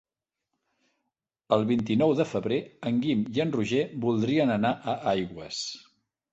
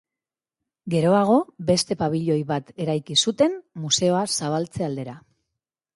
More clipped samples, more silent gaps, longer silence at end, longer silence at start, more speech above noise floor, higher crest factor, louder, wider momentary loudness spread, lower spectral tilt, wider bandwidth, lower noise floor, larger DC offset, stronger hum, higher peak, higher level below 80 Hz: neither; neither; second, 0.55 s vs 0.75 s; first, 1.5 s vs 0.85 s; second, 59 dB vs 68 dB; about the same, 20 dB vs 18 dB; second, -27 LUFS vs -22 LUFS; about the same, 10 LU vs 10 LU; first, -6 dB/octave vs -4.5 dB/octave; second, 8.2 kHz vs 11.5 kHz; second, -85 dBFS vs -90 dBFS; neither; neither; about the same, -8 dBFS vs -6 dBFS; about the same, -62 dBFS vs -60 dBFS